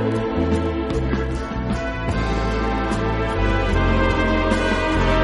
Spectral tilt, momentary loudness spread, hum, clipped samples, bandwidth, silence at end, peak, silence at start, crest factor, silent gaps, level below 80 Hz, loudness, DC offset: -6.5 dB/octave; 5 LU; none; under 0.1%; 11.5 kHz; 0 s; -6 dBFS; 0 s; 14 dB; none; -26 dBFS; -21 LUFS; under 0.1%